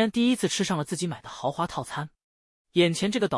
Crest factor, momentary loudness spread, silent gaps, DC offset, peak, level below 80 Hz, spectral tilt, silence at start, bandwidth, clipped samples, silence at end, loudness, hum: 16 dB; 10 LU; 2.24-2.65 s; under 0.1%; -10 dBFS; -62 dBFS; -4.5 dB/octave; 0 s; 12 kHz; under 0.1%; 0 s; -27 LUFS; none